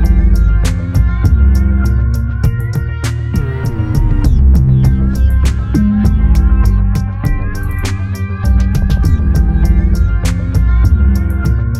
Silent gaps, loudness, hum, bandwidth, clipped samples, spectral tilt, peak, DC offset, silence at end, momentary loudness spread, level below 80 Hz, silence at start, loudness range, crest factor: none; -13 LUFS; none; 13 kHz; under 0.1%; -7.5 dB/octave; 0 dBFS; under 0.1%; 0 s; 7 LU; -12 dBFS; 0 s; 2 LU; 10 dB